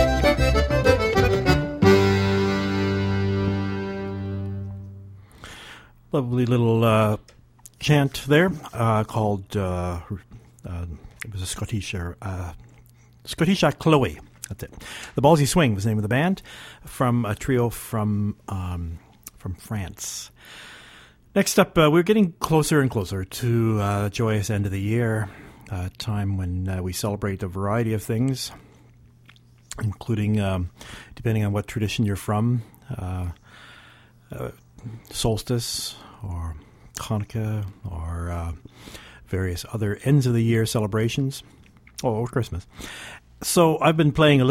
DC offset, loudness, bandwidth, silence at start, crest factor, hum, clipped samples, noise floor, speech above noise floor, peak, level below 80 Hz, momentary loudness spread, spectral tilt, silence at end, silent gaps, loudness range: under 0.1%; -23 LUFS; 16.5 kHz; 0 s; 20 dB; none; under 0.1%; -52 dBFS; 29 dB; -4 dBFS; -40 dBFS; 19 LU; -6 dB/octave; 0 s; none; 9 LU